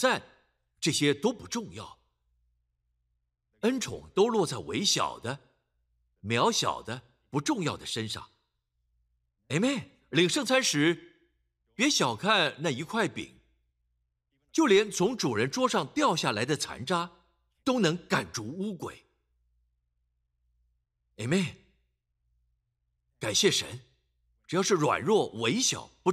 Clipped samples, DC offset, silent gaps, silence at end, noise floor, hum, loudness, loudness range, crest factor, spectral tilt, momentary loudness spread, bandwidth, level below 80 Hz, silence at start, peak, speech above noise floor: under 0.1%; under 0.1%; none; 0 s; -79 dBFS; none; -28 LUFS; 10 LU; 20 dB; -3.5 dB/octave; 14 LU; 15 kHz; -66 dBFS; 0 s; -10 dBFS; 51 dB